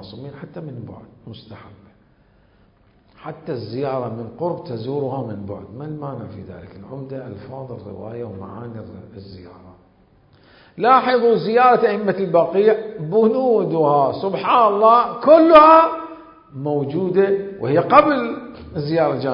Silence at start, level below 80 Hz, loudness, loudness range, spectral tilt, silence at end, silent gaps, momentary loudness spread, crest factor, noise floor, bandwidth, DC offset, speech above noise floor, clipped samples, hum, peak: 0 s; -54 dBFS; -16 LUFS; 20 LU; -9.5 dB/octave; 0 s; none; 23 LU; 18 dB; -55 dBFS; 5.4 kHz; under 0.1%; 37 dB; under 0.1%; none; 0 dBFS